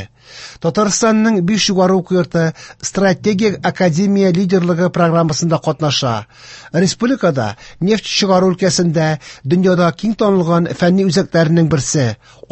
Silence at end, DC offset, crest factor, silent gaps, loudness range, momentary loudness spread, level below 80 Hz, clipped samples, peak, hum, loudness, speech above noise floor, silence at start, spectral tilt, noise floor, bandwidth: 0.35 s; under 0.1%; 14 dB; none; 2 LU; 8 LU; -48 dBFS; under 0.1%; -2 dBFS; none; -14 LUFS; 22 dB; 0 s; -5.5 dB/octave; -36 dBFS; 8.6 kHz